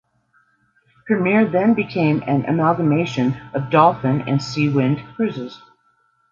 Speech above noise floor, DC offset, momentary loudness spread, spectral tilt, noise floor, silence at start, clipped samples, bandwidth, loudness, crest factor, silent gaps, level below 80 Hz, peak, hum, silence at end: 44 dB; under 0.1%; 9 LU; -7.5 dB/octave; -62 dBFS; 1.05 s; under 0.1%; 7.6 kHz; -18 LUFS; 18 dB; none; -58 dBFS; -2 dBFS; none; 0.75 s